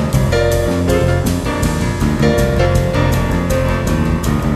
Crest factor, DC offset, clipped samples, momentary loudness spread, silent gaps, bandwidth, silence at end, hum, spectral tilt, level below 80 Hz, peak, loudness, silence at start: 12 dB; under 0.1%; under 0.1%; 3 LU; none; 13.5 kHz; 0 s; none; -6.5 dB/octave; -22 dBFS; -2 dBFS; -15 LUFS; 0 s